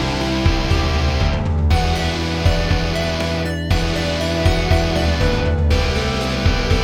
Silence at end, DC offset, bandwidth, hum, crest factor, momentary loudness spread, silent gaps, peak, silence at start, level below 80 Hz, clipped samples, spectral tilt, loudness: 0 s; under 0.1%; 14.5 kHz; none; 14 dB; 3 LU; none; -2 dBFS; 0 s; -22 dBFS; under 0.1%; -5.5 dB/octave; -18 LUFS